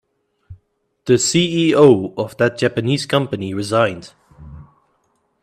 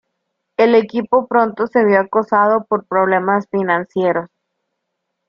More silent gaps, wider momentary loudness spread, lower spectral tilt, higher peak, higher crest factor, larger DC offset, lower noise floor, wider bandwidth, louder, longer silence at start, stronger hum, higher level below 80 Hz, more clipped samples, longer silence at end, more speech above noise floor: neither; first, 12 LU vs 5 LU; second, -5 dB/octave vs -8 dB/octave; about the same, 0 dBFS vs -2 dBFS; about the same, 18 dB vs 14 dB; neither; second, -65 dBFS vs -75 dBFS; first, 14 kHz vs 6.6 kHz; about the same, -16 LUFS vs -16 LUFS; about the same, 0.5 s vs 0.6 s; neither; first, -52 dBFS vs -62 dBFS; neither; second, 0.8 s vs 1 s; second, 49 dB vs 60 dB